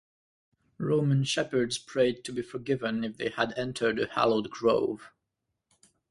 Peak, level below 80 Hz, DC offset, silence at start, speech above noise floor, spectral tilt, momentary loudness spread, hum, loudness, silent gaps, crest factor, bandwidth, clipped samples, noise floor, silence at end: -8 dBFS; -64 dBFS; under 0.1%; 0.8 s; 55 dB; -5.5 dB/octave; 9 LU; none; -29 LUFS; none; 20 dB; 11.5 kHz; under 0.1%; -83 dBFS; 1.05 s